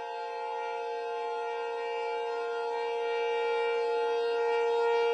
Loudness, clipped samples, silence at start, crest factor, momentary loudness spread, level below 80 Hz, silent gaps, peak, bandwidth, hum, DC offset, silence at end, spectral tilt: -31 LUFS; under 0.1%; 0 s; 12 dB; 7 LU; under -90 dBFS; none; -18 dBFS; 8.8 kHz; none; under 0.1%; 0 s; -0.5 dB/octave